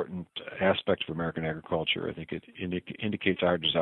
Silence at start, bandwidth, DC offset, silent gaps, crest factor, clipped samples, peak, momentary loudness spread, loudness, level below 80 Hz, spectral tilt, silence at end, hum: 0 s; 4.2 kHz; under 0.1%; none; 20 dB; under 0.1%; -10 dBFS; 11 LU; -30 LUFS; -60 dBFS; -8.5 dB/octave; 0 s; none